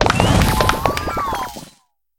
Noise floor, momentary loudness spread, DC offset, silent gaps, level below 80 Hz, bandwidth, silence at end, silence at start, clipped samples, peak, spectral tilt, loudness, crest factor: -54 dBFS; 13 LU; under 0.1%; none; -28 dBFS; 19 kHz; 0.5 s; 0 s; under 0.1%; 0 dBFS; -5 dB/octave; -17 LUFS; 18 dB